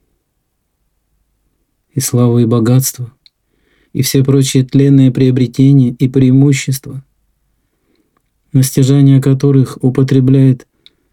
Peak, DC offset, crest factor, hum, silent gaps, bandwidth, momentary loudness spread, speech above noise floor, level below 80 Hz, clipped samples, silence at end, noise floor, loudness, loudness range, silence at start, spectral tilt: 0 dBFS; under 0.1%; 12 dB; none; none; 16.5 kHz; 11 LU; 56 dB; -48 dBFS; under 0.1%; 0.55 s; -66 dBFS; -11 LUFS; 5 LU; 1.95 s; -6.5 dB/octave